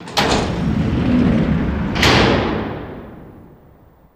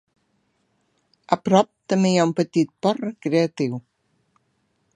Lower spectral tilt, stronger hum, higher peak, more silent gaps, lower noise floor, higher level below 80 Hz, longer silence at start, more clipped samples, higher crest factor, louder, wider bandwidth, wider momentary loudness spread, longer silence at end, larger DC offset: about the same, -5.5 dB/octave vs -6 dB/octave; neither; about the same, -2 dBFS vs 0 dBFS; neither; second, -48 dBFS vs -69 dBFS; first, -30 dBFS vs -70 dBFS; second, 0 s vs 1.3 s; neither; second, 16 dB vs 22 dB; first, -16 LUFS vs -21 LUFS; first, 16 kHz vs 10 kHz; first, 17 LU vs 9 LU; second, 0.75 s vs 1.15 s; neither